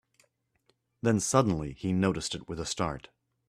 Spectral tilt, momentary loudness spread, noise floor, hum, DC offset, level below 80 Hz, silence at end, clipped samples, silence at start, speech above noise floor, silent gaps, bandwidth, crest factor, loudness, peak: -5 dB/octave; 10 LU; -73 dBFS; none; under 0.1%; -54 dBFS; 0.5 s; under 0.1%; 1.05 s; 44 dB; none; 14 kHz; 24 dB; -30 LUFS; -8 dBFS